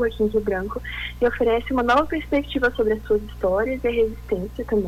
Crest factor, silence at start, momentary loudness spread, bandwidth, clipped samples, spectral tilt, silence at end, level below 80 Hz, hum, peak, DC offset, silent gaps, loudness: 12 dB; 0 s; 8 LU; 14 kHz; under 0.1%; -6.5 dB/octave; 0 s; -38 dBFS; 60 Hz at -35 dBFS; -10 dBFS; under 0.1%; none; -23 LUFS